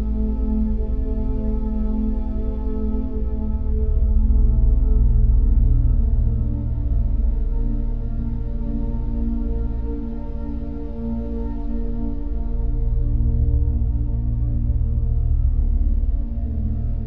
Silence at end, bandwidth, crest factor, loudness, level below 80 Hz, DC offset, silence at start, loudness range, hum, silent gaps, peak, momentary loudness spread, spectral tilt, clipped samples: 0 s; 1.8 kHz; 12 dB; -24 LUFS; -20 dBFS; 2%; 0 s; 7 LU; none; none; -6 dBFS; 8 LU; -12.5 dB/octave; under 0.1%